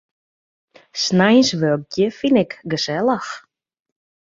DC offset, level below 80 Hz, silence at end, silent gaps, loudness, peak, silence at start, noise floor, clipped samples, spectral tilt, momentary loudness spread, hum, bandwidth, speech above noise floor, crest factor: under 0.1%; -60 dBFS; 0.95 s; none; -18 LUFS; -2 dBFS; 0.95 s; under -90 dBFS; under 0.1%; -5 dB/octave; 13 LU; none; 7.8 kHz; over 72 dB; 18 dB